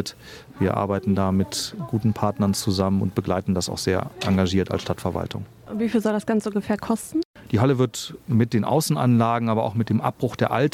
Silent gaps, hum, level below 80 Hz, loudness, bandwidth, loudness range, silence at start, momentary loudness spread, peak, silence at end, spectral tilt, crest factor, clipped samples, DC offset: 7.25-7.34 s; none; -52 dBFS; -23 LUFS; 16 kHz; 3 LU; 0 s; 7 LU; -6 dBFS; 0.05 s; -6 dB/octave; 16 dB; under 0.1%; under 0.1%